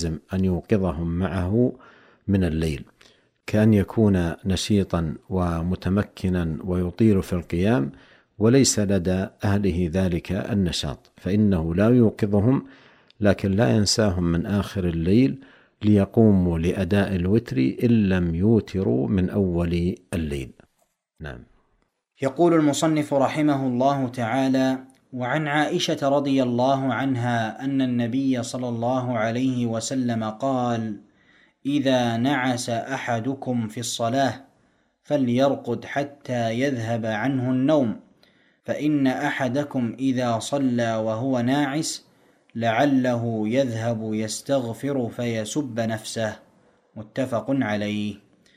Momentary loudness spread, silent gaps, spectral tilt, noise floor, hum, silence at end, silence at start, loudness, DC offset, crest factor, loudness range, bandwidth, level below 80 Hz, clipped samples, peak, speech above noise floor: 9 LU; none; -6 dB/octave; -70 dBFS; none; 0.4 s; 0 s; -23 LUFS; under 0.1%; 20 dB; 4 LU; 15.5 kHz; -46 dBFS; under 0.1%; -4 dBFS; 48 dB